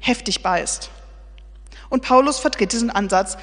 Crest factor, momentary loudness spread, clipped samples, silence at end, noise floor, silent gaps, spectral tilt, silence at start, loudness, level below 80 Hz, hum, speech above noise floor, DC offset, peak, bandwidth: 20 dB; 10 LU; under 0.1%; 0 s; -40 dBFS; none; -3 dB/octave; 0 s; -19 LUFS; -40 dBFS; none; 21 dB; under 0.1%; 0 dBFS; 10 kHz